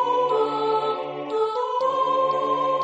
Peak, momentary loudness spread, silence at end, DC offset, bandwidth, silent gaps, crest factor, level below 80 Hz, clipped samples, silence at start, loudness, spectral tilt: -12 dBFS; 5 LU; 0 s; under 0.1%; 8.4 kHz; none; 12 dB; -76 dBFS; under 0.1%; 0 s; -23 LUFS; -5 dB/octave